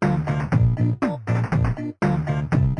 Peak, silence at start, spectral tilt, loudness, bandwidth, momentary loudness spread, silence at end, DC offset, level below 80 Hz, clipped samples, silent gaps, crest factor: -6 dBFS; 0 s; -9 dB/octave; -22 LUFS; 9.6 kHz; 4 LU; 0 s; under 0.1%; -36 dBFS; under 0.1%; none; 14 dB